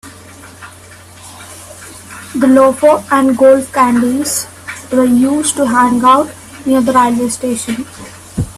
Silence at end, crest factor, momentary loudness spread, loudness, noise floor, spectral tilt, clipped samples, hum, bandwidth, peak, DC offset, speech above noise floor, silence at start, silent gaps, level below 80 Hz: 0.05 s; 12 dB; 22 LU; -11 LUFS; -36 dBFS; -4.5 dB/octave; under 0.1%; none; 14.5 kHz; 0 dBFS; under 0.1%; 26 dB; 0.05 s; none; -44 dBFS